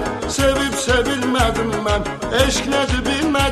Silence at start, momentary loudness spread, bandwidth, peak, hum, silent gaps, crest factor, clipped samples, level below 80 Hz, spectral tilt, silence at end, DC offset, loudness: 0 s; 4 LU; 13.5 kHz; -2 dBFS; none; none; 16 dB; under 0.1%; -28 dBFS; -4 dB/octave; 0 s; under 0.1%; -18 LUFS